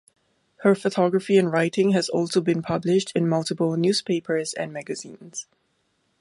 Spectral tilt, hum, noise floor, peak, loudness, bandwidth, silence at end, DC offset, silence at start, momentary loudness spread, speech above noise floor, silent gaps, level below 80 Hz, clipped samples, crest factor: -5.5 dB/octave; none; -70 dBFS; -6 dBFS; -23 LUFS; 11.5 kHz; 0.8 s; under 0.1%; 0.6 s; 14 LU; 47 dB; none; -66 dBFS; under 0.1%; 16 dB